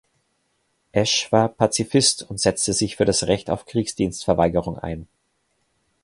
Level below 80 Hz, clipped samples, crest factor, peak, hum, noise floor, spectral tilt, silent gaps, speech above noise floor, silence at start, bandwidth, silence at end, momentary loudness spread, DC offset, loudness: -46 dBFS; under 0.1%; 22 dB; -2 dBFS; none; -70 dBFS; -4 dB/octave; none; 49 dB; 0.95 s; 11.5 kHz; 1 s; 8 LU; under 0.1%; -21 LUFS